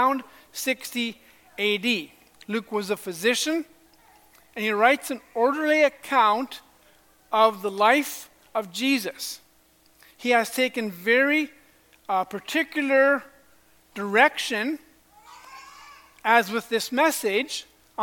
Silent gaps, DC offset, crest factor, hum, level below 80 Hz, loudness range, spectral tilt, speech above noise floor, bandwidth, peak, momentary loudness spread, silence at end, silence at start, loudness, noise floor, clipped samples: none; under 0.1%; 22 dB; none; -70 dBFS; 4 LU; -2.5 dB/octave; 36 dB; 17.5 kHz; -2 dBFS; 17 LU; 0 s; 0 s; -24 LUFS; -60 dBFS; under 0.1%